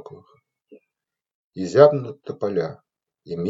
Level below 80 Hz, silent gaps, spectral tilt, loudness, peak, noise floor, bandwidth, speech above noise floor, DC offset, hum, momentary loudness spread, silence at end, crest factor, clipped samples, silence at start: -72 dBFS; 1.35-1.51 s; -7 dB/octave; -20 LUFS; 0 dBFS; -86 dBFS; 7.8 kHz; 67 dB; under 0.1%; none; 19 LU; 0 s; 24 dB; under 0.1%; 0.1 s